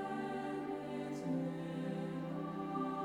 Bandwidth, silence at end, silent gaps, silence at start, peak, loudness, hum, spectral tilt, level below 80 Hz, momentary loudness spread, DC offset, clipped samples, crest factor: 13.5 kHz; 0 s; none; 0 s; -26 dBFS; -41 LUFS; none; -7.5 dB/octave; -74 dBFS; 3 LU; under 0.1%; under 0.1%; 14 dB